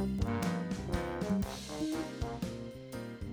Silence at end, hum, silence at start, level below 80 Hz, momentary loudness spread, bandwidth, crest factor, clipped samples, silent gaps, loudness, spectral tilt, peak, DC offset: 0 s; none; 0 s; -46 dBFS; 10 LU; over 20 kHz; 20 dB; under 0.1%; none; -37 LUFS; -6 dB/octave; -16 dBFS; under 0.1%